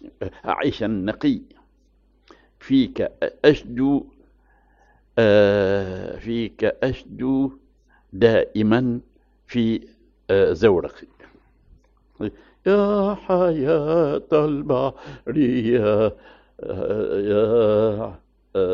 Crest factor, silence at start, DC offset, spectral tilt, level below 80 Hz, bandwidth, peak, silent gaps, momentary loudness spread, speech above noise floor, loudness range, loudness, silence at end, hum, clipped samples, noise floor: 20 dB; 0.05 s; under 0.1%; -6 dB/octave; -48 dBFS; 7 kHz; -2 dBFS; none; 13 LU; 39 dB; 3 LU; -21 LUFS; 0 s; none; under 0.1%; -59 dBFS